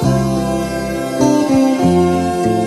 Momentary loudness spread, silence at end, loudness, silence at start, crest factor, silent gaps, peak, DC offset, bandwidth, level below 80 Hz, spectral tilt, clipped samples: 7 LU; 0 s; -15 LUFS; 0 s; 14 dB; none; 0 dBFS; under 0.1%; 13 kHz; -36 dBFS; -6.5 dB/octave; under 0.1%